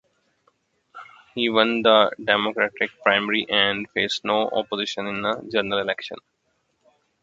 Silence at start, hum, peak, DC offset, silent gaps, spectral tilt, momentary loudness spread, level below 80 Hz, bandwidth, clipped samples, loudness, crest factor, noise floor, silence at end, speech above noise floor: 0.95 s; none; 0 dBFS; under 0.1%; none; -4 dB/octave; 9 LU; -64 dBFS; 7.8 kHz; under 0.1%; -21 LUFS; 24 dB; -71 dBFS; 1.05 s; 49 dB